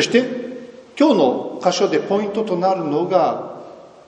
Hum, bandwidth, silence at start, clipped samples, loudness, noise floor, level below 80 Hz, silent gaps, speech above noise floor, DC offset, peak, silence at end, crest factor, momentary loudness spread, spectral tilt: none; 10 kHz; 0 s; under 0.1%; -19 LUFS; -39 dBFS; -66 dBFS; none; 22 dB; under 0.1%; -2 dBFS; 0.2 s; 18 dB; 17 LU; -5 dB/octave